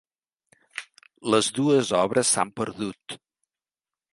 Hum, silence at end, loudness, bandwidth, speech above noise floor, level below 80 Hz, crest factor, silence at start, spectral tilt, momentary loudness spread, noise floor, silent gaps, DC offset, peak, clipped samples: none; 1 s; -23 LUFS; 11.5 kHz; over 66 dB; -66 dBFS; 22 dB; 0.75 s; -3.5 dB/octave; 18 LU; under -90 dBFS; none; under 0.1%; -6 dBFS; under 0.1%